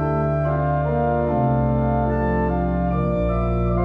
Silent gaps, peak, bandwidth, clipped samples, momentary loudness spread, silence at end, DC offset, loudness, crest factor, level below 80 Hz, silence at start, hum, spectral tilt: none; -10 dBFS; 4.7 kHz; under 0.1%; 2 LU; 0 s; under 0.1%; -21 LUFS; 10 dB; -28 dBFS; 0 s; none; -11.5 dB/octave